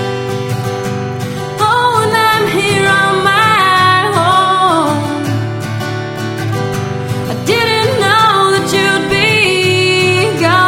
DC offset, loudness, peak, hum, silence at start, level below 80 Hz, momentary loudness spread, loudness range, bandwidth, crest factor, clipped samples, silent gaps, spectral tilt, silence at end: under 0.1%; -12 LUFS; 0 dBFS; none; 0 s; -44 dBFS; 10 LU; 5 LU; 16.5 kHz; 12 dB; under 0.1%; none; -4.5 dB/octave; 0 s